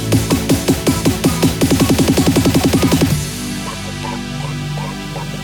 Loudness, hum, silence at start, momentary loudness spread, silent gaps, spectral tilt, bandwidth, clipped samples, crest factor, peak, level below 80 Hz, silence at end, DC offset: -16 LUFS; 50 Hz at -30 dBFS; 0 s; 11 LU; none; -5 dB/octave; over 20 kHz; under 0.1%; 14 dB; 0 dBFS; -30 dBFS; 0 s; under 0.1%